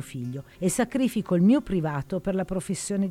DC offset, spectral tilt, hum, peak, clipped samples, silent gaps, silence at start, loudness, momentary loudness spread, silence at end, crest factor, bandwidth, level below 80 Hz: under 0.1%; -6 dB/octave; none; -12 dBFS; under 0.1%; none; 0 s; -26 LUFS; 10 LU; 0 s; 14 dB; 15 kHz; -50 dBFS